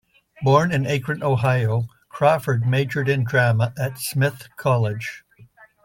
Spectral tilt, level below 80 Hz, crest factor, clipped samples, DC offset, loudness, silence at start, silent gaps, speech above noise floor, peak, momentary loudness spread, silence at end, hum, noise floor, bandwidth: -6.5 dB/octave; -56 dBFS; 16 dB; under 0.1%; under 0.1%; -21 LUFS; 0.4 s; none; 30 dB; -4 dBFS; 8 LU; 0.4 s; none; -50 dBFS; 17 kHz